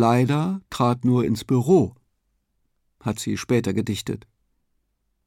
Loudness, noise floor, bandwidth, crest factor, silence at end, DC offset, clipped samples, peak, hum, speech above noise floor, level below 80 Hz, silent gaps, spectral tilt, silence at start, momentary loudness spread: -23 LUFS; -72 dBFS; 16 kHz; 16 dB; 1.1 s; under 0.1%; under 0.1%; -6 dBFS; none; 51 dB; -56 dBFS; none; -6.5 dB/octave; 0 s; 11 LU